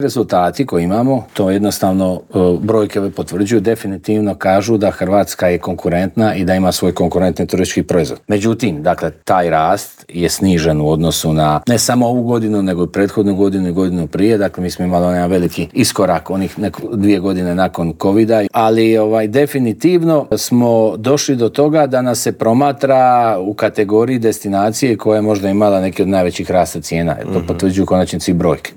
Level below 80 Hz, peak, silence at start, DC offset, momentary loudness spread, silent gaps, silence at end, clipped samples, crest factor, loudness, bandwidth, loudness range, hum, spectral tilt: -46 dBFS; 0 dBFS; 0 s; under 0.1%; 5 LU; none; 0.05 s; under 0.1%; 12 dB; -14 LUFS; over 20 kHz; 2 LU; none; -6 dB/octave